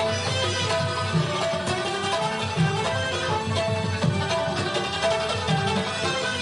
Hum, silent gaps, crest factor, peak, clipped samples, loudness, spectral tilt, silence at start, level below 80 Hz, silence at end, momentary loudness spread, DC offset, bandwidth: none; none; 14 dB; -10 dBFS; under 0.1%; -24 LUFS; -4.5 dB/octave; 0 s; -52 dBFS; 0 s; 2 LU; under 0.1%; 11.5 kHz